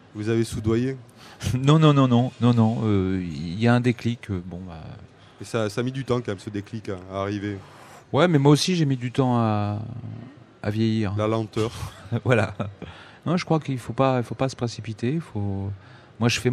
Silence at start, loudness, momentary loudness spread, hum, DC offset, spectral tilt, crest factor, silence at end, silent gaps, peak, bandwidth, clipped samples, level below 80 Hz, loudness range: 0.15 s; -24 LUFS; 16 LU; none; under 0.1%; -6.5 dB/octave; 22 dB; 0 s; none; -2 dBFS; 13.5 kHz; under 0.1%; -52 dBFS; 8 LU